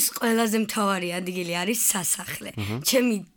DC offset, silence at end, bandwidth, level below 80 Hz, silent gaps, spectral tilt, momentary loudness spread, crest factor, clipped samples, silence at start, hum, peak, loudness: under 0.1%; 0.1 s; over 20 kHz; -64 dBFS; none; -3 dB/octave; 8 LU; 20 dB; under 0.1%; 0 s; none; -6 dBFS; -24 LUFS